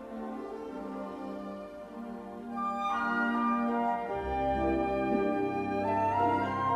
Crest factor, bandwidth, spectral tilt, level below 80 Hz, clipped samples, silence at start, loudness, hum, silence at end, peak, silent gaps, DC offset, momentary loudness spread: 16 dB; 12.5 kHz; -7.5 dB/octave; -52 dBFS; under 0.1%; 0 s; -31 LUFS; 50 Hz at -60 dBFS; 0 s; -16 dBFS; none; under 0.1%; 13 LU